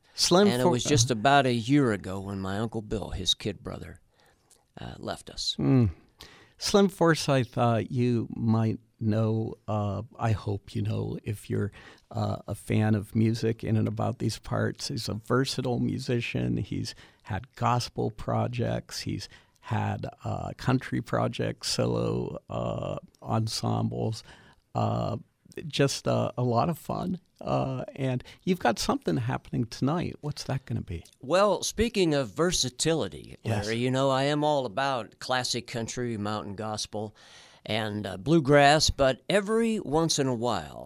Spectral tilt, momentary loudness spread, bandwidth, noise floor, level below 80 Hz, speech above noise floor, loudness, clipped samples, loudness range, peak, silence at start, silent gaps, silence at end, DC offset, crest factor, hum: -5 dB/octave; 12 LU; 15.5 kHz; -63 dBFS; -50 dBFS; 36 dB; -28 LUFS; under 0.1%; 6 LU; -8 dBFS; 0.15 s; none; 0 s; under 0.1%; 20 dB; none